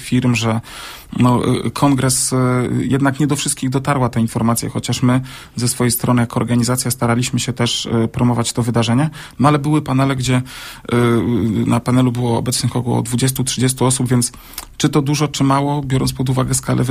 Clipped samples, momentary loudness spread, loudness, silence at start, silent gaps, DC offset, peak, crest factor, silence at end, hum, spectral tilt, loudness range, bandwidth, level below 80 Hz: under 0.1%; 5 LU; -16 LUFS; 0 s; none; under 0.1%; 0 dBFS; 16 dB; 0 s; none; -5 dB/octave; 1 LU; 15.5 kHz; -42 dBFS